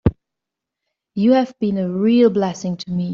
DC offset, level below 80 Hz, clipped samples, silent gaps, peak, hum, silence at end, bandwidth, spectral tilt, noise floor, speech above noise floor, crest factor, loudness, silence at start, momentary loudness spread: under 0.1%; -40 dBFS; under 0.1%; none; -2 dBFS; none; 0 s; 7.4 kHz; -7 dB/octave; -83 dBFS; 67 dB; 16 dB; -18 LUFS; 0.05 s; 10 LU